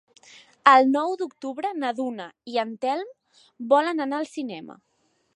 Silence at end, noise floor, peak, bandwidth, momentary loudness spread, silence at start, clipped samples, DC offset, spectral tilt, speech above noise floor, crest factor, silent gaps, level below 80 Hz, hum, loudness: 0.6 s; -51 dBFS; -2 dBFS; 11 kHz; 18 LU; 0.65 s; under 0.1%; under 0.1%; -4 dB/octave; 27 dB; 24 dB; none; -82 dBFS; none; -23 LUFS